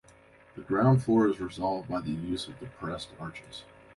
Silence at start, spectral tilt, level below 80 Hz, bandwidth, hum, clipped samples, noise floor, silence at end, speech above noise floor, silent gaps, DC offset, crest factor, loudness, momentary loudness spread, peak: 0.55 s; -7.5 dB/octave; -56 dBFS; 11.5 kHz; none; under 0.1%; -57 dBFS; 0.35 s; 28 dB; none; under 0.1%; 18 dB; -29 LUFS; 21 LU; -12 dBFS